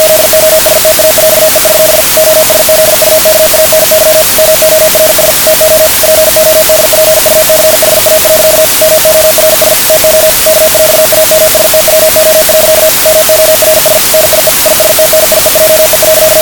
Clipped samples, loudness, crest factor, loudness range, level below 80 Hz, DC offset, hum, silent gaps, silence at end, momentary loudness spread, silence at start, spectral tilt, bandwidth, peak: 10%; -3 LUFS; 4 dB; 0 LU; -32 dBFS; 0.4%; none; none; 0 s; 0 LU; 0 s; -1 dB/octave; over 20 kHz; 0 dBFS